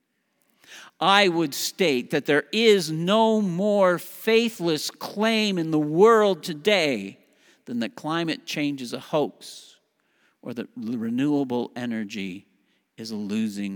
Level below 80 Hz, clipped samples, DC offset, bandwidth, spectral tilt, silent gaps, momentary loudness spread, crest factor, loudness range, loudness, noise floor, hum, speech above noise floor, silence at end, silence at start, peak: -80 dBFS; under 0.1%; under 0.1%; over 20 kHz; -4.5 dB/octave; none; 16 LU; 22 dB; 9 LU; -23 LUFS; -70 dBFS; none; 47 dB; 0 s; 0.7 s; -2 dBFS